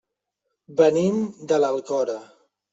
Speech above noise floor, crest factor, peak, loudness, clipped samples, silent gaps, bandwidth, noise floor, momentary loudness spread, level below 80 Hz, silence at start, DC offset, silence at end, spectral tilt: 58 dB; 18 dB; -4 dBFS; -22 LUFS; under 0.1%; none; 8 kHz; -80 dBFS; 11 LU; -68 dBFS; 0.7 s; under 0.1%; 0.5 s; -6 dB/octave